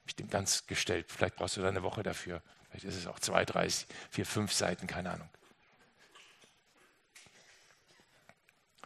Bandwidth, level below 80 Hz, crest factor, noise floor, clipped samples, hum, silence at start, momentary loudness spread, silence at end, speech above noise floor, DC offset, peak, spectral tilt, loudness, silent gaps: 13 kHz; -68 dBFS; 30 dB; -69 dBFS; under 0.1%; none; 0.05 s; 14 LU; 1.6 s; 33 dB; under 0.1%; -8 dBFS; -3 dB/octave; -35 LUFS; none